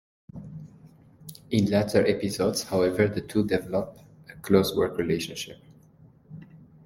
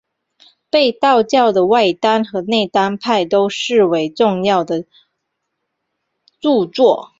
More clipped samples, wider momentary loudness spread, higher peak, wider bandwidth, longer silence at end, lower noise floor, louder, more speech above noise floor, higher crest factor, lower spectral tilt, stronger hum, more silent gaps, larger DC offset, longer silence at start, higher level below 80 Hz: neither; first, 23 LU vs 5 LU; second, -6 dBFS vs -2 dBFS; first, 16.5 kHz vs 7.8 kHz; about the same, 0.2 s vs 0.15 s; second, -55 dBFS vs -74 dBFS; second, -25 LUFS vs -15 LUFS; second, 30 dB vs 60 dB; first, 22 dB vs 14 dB; about the same, -5.5 dB/octave vs -5 dB/octave; neither; neither; neither; second, 0.35 s vs 0.75 s; about the same, -56 dBFS vs -60 dBFS